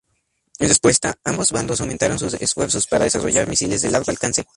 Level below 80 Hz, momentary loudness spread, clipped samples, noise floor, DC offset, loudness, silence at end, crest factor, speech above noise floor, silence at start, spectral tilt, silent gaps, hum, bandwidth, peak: -44 dBFS; 7 LU; under 0.1%; -69 dBFS; under 0.1%; -18 LUFS; 0.15 s; 18 dB; 50 dB; 0.6 s; -3 dB/octave; none; none; 11.5 kHz; -2 dBFS